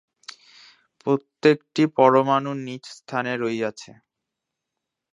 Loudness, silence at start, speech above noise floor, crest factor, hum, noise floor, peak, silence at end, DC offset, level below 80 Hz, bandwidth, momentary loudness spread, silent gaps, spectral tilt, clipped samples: -22 LUFS; 1.05 s; 62 dB; 22 dB; none; -84 dBFS; -2 dBFS; 1.3 s; under 0.1%; -74 dBFS; 10.5 kHz; 24 LU; none; -6 dB/octave; under 0.1%